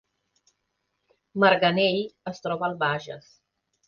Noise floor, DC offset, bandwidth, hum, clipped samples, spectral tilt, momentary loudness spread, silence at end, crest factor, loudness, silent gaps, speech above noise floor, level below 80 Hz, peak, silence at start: -78 dBFS; under 0.1%; 7 kHz; none; under 0.1%; -6 dB/octave; 17 LU; 0.7 s; 22 dB; -24 LUFS; none; 53 dB; -68 dBFS; -6 dBFS; 1.35 s